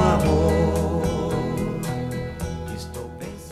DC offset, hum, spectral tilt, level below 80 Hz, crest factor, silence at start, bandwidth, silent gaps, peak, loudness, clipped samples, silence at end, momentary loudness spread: under 0.1%; none; -7 dB/octave; -32 dBFS; 18 dB; 0 s; 15 kHz; none; -6 dBFS; -24 LUFS; under 0.1%; 0 s; 15 LU